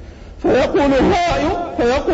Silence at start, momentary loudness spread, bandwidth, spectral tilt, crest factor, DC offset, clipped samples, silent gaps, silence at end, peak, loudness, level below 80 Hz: 0 s; 5 LU; 8 kHz; -6 dB/octave; 12 dB; under 0.1%; under 0.1%; none; 0 s; -4 dBFS; -16 LUFS; -32 dBFS